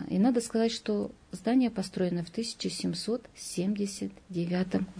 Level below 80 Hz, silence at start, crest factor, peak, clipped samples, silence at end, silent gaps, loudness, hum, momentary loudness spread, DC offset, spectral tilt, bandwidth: -62 dBFS; 0 s; 16 dB; -14 dBFS; under 0.1%; 0 s; none; -31 LUFS; none; 9 LU; under 0.1%; -5.5 dB/octave; 11 kHz